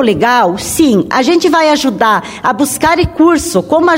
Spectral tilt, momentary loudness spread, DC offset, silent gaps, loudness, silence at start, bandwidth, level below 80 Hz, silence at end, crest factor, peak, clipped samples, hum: -4 dB/octave; 4 LU; under 0.1%; none; -10 LUFS; 0 s; 16.5 kHz; -34 dBFS; 0 s; 10 dB; 0 dBFS; under 0.1%; none